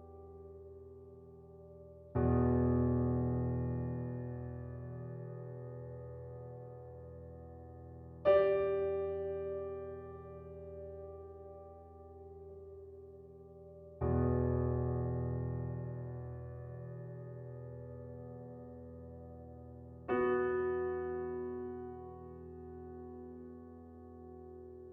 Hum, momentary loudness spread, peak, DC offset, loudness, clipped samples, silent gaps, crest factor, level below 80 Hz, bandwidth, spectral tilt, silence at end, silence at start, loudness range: none; 21 LU; -18 dBFS; under 0.1%; -37 LUFS; under 0.1%; none; 22 dB; -56 dBFS; 4.5 kHz; -9 dB/octave; 0 s; 0 s; 14 LU